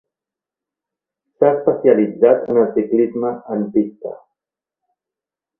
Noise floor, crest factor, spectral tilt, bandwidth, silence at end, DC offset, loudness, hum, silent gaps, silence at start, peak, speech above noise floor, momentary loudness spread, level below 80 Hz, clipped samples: -88 dBFS; 18 dB; -11.5 dB/octave; 3.2 kHz; 1.45 s; under 0.1%; -16 LUFS; none; none; 1.4 s; 0 dBFS; 72 dB; 10 LU; -64 dBFS; under 0.1%